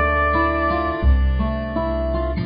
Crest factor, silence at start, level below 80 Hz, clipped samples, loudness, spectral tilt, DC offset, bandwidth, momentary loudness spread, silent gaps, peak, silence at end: 12 dB; 0 s; -22 dBFS; under 0.1%; -20 LUFS; -12 dB/octave; under 0.1%; 5.2 kHz; 6 LU; none; -6 dBFS; 0 s